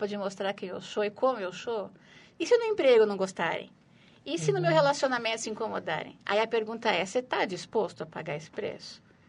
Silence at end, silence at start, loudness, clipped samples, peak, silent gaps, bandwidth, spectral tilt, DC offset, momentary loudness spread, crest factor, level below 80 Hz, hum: 0.3 s; 0 s; -29 LUFS; under 0.1%; -10 dBFS; none; 11 kHz; -4.5 dB/octave; under 0.1%; 13 LU; 20 dB; -74 dBFS; none